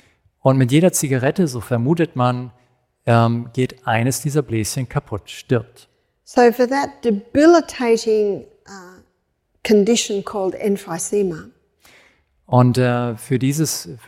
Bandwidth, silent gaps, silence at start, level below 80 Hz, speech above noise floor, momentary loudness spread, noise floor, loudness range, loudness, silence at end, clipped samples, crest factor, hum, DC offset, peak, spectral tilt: 16.5 kHz; none; 0.45 s; -54 dBFS; 50 dB; 10 LU; -67 dBFS; 4 LU; -18 LUFS; 0.1 s; under 0.1%; 18 dB; none; under 0.1%; -2 dBFS; -5.5 dB/octave